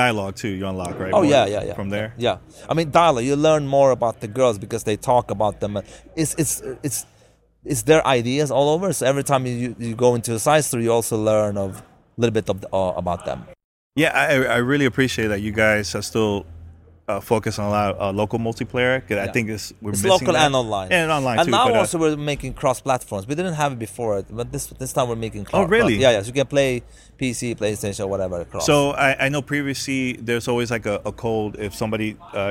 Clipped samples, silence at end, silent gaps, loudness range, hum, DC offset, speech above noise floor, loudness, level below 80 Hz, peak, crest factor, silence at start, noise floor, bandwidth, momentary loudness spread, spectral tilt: under 0.1%; 0 s; 13.64-13.91 s; 4 LU; none; under 0.1%; 35 dB; -21 LUFS; -46 dBFS; -2 dBFS; 18 dB; 0 s; -55 dBFS; 16.5 kHz; 11 LU; -4.5 dB/octave